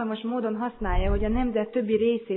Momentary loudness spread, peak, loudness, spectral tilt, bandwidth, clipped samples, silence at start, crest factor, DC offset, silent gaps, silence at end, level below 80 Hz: 5 LU; -12 dBFS; -27 LUFS; -11 dB/octave; 4.1 kHz; under 0.1%; 0 s; 14 dB; under 0.1%; none; 0 s; -32 dBFS